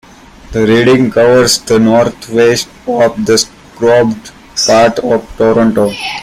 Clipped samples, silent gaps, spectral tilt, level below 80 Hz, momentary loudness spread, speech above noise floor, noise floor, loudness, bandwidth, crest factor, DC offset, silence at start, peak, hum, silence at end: under 0.1%; none; -4 dB/octave; -40 dBFS; 8 LU; 23 dB; -32 dBFS; -10 LUFS; 16 kHz; 10 dB; under 0.1%; 0.5 s; 0 dBFS; none; 0 s